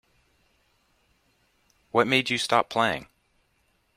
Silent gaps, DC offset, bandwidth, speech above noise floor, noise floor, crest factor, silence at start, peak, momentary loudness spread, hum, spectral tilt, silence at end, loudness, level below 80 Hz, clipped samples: none; under 0.1%; 16 kHz; 45 dB; -69 dBFS; 24 dB; 1.95 s; -6 dBFS; 6 LU; none; -3.5 dB/octave; 0.95 s; -24 LUFS; -64 dBFS; under 0.1%